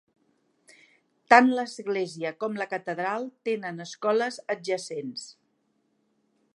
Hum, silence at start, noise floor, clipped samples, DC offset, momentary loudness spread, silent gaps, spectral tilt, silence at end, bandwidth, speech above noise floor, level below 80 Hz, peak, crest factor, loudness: none; 1.3 s; -72 dBFS; under 0.1%; under 0.1%; 17 LU; none; -4.5 dB/octave; 1.25 s; 11.5 kHz; 46 dB; -84 dBFS; 0 dBFS; 28 dB; -26 LUFS